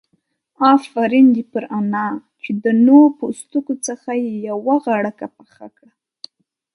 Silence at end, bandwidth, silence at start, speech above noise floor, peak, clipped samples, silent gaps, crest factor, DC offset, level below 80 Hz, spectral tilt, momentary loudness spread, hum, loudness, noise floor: 1.05 s; 11 kHz; 0.6 s; 51 dB; 0 dBFS; under 0.1%; none; 16 dB; under 0.1%; -70 dBFS; -5.5 dB/octave; 14 LU; none; -16 LUFS; -67 dBFS